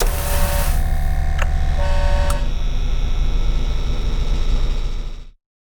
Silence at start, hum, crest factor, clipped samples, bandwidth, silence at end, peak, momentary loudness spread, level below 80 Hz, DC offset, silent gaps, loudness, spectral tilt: 0 s; none; 14 dB; under 0.1%; 19.5 kHz; 0.4 s; -4 dBFS; 6 LU; -18 dBFS; under 0.1%; none; -23 LUFS; -5 dB/octave